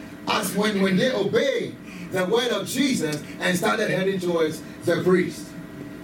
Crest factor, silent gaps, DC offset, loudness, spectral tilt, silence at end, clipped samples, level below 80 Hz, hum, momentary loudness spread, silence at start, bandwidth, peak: 16 dB; none; under 0.1%; -23 LUFS; -4.5 dB/octave; 0 s; under 0.1%; -60 dBFS; none; 10 LU; 0 s; 17.5 kHz; -6 dBFS